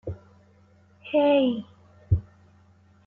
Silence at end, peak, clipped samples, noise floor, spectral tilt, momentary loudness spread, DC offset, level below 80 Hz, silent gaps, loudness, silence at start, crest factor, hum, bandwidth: 0.85 s; -10 dBFS; under 0.1%; -57 dBFS; -9.5 dB/octave; 24 LU; under 0.1%; -46 dBFS; none; -24 LUFS; 0.05 s; 18 dB; none; 4.3 kHz